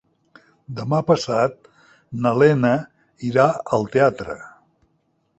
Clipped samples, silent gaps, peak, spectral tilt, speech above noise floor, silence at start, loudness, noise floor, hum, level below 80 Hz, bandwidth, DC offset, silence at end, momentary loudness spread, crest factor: under 0.1%; none; -2 dBFS; -7 dB/octave; 48 dB; 0.7 s; -19 LUFS; -67 dBFS; none; -56 dBFS; 8.4 kHz; under 0.1%; 0.9 s; 16 LU; 20 dB